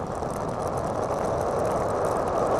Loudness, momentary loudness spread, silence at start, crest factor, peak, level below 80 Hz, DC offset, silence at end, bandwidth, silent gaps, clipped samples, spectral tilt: -27 LUFS; 4 LU; 0 s; 12 dB; -14 dBFS; -44 dBFS; under 0.1%; 0 s; 14 kHz; none; under 0.1%; -6.5 dB/octave